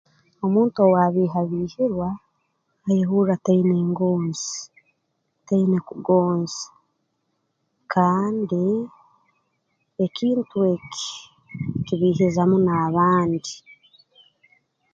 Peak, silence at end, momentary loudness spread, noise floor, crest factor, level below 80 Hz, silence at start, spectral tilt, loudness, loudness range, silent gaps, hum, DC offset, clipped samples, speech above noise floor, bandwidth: -4 dBFS; 1.35 s; 15 LU; -73 dBFS; 18 dB; -60 dBFS; 0.4 s; -6.5 dB/octave; -21 LUFS; 4 LU; none; none; under 0.1%; under 0.1%; 53 dB; 7.6 kHz